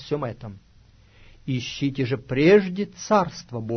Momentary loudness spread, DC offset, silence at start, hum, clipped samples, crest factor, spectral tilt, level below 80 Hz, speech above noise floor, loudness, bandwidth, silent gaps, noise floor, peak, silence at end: 18 LU; under 0.1%; 0 s; none; under 0.1%; 18 dB; -6 dB/octave; -52 dBFS; 31 dB; -23 LUFS; 6.6 kHz; none; -53 dBFS; -6 dBFS; 0 s